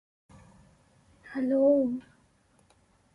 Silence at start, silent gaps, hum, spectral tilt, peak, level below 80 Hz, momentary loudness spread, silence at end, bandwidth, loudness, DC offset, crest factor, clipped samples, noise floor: 1.25 s; none; none; -8 dB/octave; -14 dBFS; -68 dBFS; 16 LU; 1.15 s; 10.5 kHz; -27 LUFS; under 0.1%; 18 dB; under 0.1%; -65 dBFS